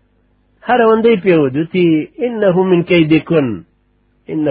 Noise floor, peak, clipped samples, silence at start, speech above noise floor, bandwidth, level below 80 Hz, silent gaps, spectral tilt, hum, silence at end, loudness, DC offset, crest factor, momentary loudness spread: -57 dBFS; 0 dBFS; under 0.1%; 0.65 s; 45 dB; 5 kHz; -52 dBFS; none; -11.5 dB/octave; 50 Hz at -45 dBFS; 0 s; -13 LUFS; under 0.1%; 14 dB; 10 LU